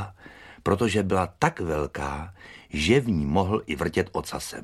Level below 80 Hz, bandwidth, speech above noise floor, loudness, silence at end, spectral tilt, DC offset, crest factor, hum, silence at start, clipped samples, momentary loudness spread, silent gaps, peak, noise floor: -44 dBFS; 14.5 kHz; 22 dB; -26 LUFS; 0 s; -5.5 dB/octave; under 0.1%; 24 dB; none; 0 s; under 0.1%; 14 LU; none; -2 dBFS; -48 dBFS